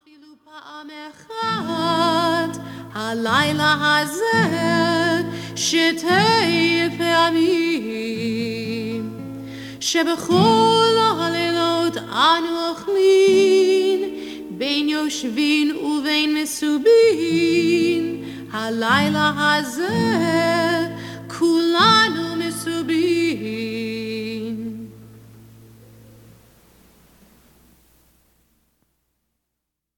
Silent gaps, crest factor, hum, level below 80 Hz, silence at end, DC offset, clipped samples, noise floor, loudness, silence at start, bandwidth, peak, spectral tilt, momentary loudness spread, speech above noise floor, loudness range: none; 16 dB; none; -60 dBFS; 4.8 s; under 0.1%; under 0.1%; -80 dBFS; -19 LUFS; 0.55 s; 18 kHz; -4 dBFS; -4 dB/octave; 14 LU; 62 dB; 6 LU